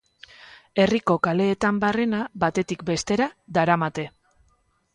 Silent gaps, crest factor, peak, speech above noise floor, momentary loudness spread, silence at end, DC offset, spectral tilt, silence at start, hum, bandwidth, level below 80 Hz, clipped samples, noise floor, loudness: none; 20 dB; -6 dBFS; 43 dB; 7 LU; 0.85 s; under 0.1%; -5.5 dB/octave; 0.75 s; none; 11 kHz; -54 dBFS; under 0.1%; -65 dBFS; -23 LUFS